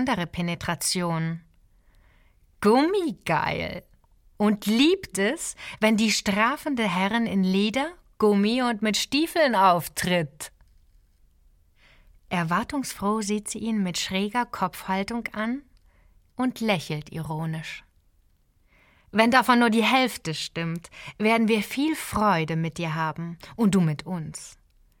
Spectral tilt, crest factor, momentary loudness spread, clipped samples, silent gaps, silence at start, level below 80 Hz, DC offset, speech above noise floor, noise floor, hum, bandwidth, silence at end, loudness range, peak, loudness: -4.5 dB/octave; 22 dB; 13 LU; under 0.1%; none; 0 s; -54 dBFS; under 0.1%; 39 dB; -63 dBFS; none; 17 kHz; 0.5 s; 7 LU; -2 dBFS; -24 LUFS